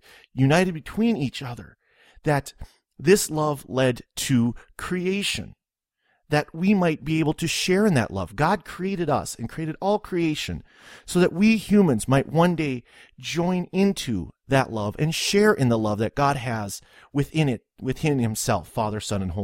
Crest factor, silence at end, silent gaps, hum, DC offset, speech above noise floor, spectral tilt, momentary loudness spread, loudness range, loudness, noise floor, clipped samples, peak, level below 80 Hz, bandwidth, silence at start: 20 dB; 0 s; none; none; under 0.1%; 55 dB; -5.5 dB/octave; 12 LU; 3 LU; -23 LUFS; -78 dBFS; under 0.1%; -4 dBFS; -48 dBFS; 16.5 kHz; 0.35 s